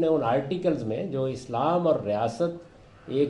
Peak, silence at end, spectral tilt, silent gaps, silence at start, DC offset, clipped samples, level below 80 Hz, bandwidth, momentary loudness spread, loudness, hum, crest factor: -12 dBFS; 0 s; -7.5 dB/octave; none; 0 s; under 0.1%; under 0.1%; -60 dBFS; 11 kHz; 7 LU; -27 LUFS; none; 14 dB